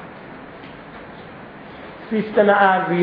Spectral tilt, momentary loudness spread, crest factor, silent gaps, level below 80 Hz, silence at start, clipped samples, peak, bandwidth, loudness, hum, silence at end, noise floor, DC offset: -9.5 dB/octave; 23 LU; 20 dB; none; -58 dBFS; 0 s; under 0.1%; -2 dBFS; 5.2 kHz; -17 LUFS; none; 0 s; -38 dBFS; under 0.1%